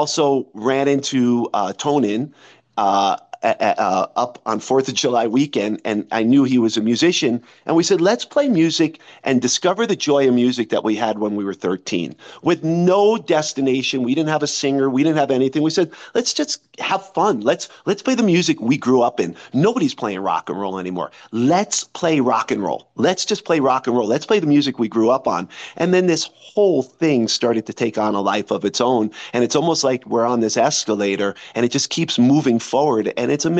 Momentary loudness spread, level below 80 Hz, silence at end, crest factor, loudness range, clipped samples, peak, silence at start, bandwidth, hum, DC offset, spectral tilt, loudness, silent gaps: 7 LU; -66 dBFS; 0 s; 16 dB; 2 LU; under 0.1%; -2 dBFS; 0 s; 8.8 kHz; none; under 0.1%; -4.5 dB/octave; -18 LUFS; none